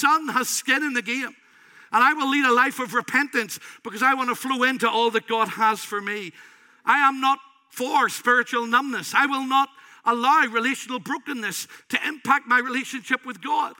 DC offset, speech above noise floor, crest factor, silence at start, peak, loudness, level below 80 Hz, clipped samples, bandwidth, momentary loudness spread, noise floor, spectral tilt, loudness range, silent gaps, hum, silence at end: under 0.1%; 29 dB; 18 dB; 0 s; -4 dBFS; -22 LUFS; -86 dBFS; under 0.1%; 17 kHz; 10 LU; -52 dBFS; -2 dB/octave; 2 LU; none; none; 0.05 s